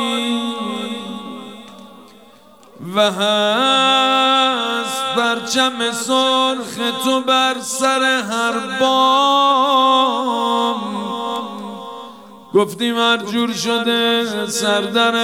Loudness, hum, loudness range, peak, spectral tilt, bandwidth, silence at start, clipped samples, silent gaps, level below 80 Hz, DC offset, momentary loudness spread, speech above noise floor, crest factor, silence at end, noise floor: -16 LUFS; none; 5 LU; -4 dBFS; -2.5 dB/octave; 17 kHz; 0 s; under 0.1%; none; -70 dBFS; 0.1%; 15 LU; 30 dB; 14 dB; 0 s; -46 dBFS